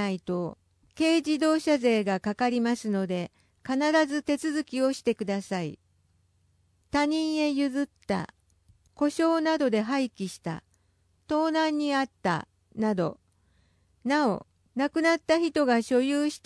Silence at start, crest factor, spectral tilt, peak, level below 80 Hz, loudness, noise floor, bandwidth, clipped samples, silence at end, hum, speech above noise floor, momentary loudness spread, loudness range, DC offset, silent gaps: 0 s; 16 dB; -5 dB/octave; -10 dBFS; -66 dBFS; -27 LUFS; -68 dBFS; 11 kHz; under 0.1%; 0.1 s; none; 42 dB; 10 LU; 3 LU; under 0.1%; none